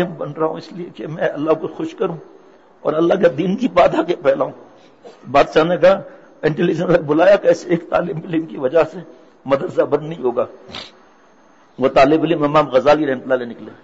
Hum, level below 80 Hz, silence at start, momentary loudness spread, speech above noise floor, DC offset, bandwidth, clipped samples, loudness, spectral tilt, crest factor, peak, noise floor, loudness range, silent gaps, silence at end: none; -50 dBFS; 0 s; 13 LU; 34 dB; 0.2%; 8 kHz; under 0.1%; -17 LUFS; -7 dB/octave; 14 dB; -4 dBFS; -51 dBFS; 5 LU; none; 0.1 s